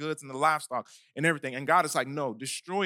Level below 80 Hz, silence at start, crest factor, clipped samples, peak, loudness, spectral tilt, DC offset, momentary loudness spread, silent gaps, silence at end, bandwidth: -88 dBFS; 0 s; 20 dB; under 0.1%; -10 dBFS; -29 LUFS; -4 dB/octave; under 0.1%; 11 LU; none; 0 s; 17.5 kHz